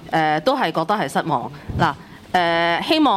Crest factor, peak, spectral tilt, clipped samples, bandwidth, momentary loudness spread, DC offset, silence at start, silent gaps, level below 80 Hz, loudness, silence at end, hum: 14 dB; -6 dBFS; -5.5 dB/octave; under 0.1%; 15.5 kHz; 7 LU; under 0.1%; 0 s; none; -46 dBFS; -20 LUFS; 0 s; none